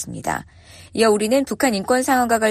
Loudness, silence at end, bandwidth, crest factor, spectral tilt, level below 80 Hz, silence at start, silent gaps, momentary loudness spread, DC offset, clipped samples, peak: -19 LUFS; 0 s; 14.5 kHz; 16 dB; -3.5 dB/octave; -52 dBFS; 0 s; none; 10 LU; under 0.1%; under 0.1%; -4 dBFS